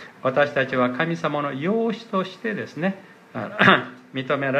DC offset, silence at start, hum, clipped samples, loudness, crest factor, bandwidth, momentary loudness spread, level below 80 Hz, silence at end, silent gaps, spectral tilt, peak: under 0.1%; 0 s; none; under 0.1%; -22 LUFS; 22 dB; 9.2 kHz; 15 LU; -70 dBFS; 0 s; none; -6.5 dB/octave; 0 dBFS